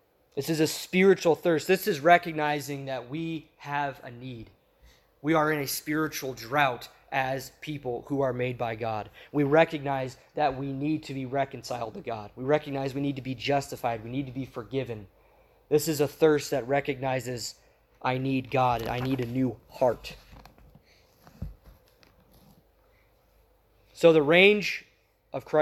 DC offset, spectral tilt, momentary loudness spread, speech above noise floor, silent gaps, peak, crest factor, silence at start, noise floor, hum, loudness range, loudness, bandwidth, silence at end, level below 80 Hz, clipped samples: under 0.1%; -5 dB/octave; 16 LU; 36 dB; none; -6 dBFS; 24 dB; 0.35 s; -63 dBFS; none; 6 LU; -27 LUFS; 16 kHz; 0 s; -58 dBFS; under 0.1%